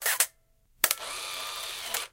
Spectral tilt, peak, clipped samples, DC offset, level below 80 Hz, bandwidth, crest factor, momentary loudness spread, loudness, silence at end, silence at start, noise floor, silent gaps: 2 dB/octave; -2 dBFS; under 0.1%; under 0.1%; -66 dBFS; 17 kHz; 30 dB; 8 LU; -29 LUFS; 0.05 s; 0 s; -65 dBFS; none